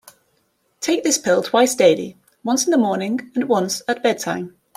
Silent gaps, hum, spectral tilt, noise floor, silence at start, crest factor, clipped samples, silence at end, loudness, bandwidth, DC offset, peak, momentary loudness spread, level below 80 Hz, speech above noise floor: none; none; -3.5 dB/octave; -65 dBFS; 0.8 s; 18 dB; under 0.1%; 0.25 s; -19 LUFS; 16 kHz; under 0.1%; -2 dBFS; 10 LU; -66 dBFS; 47 dB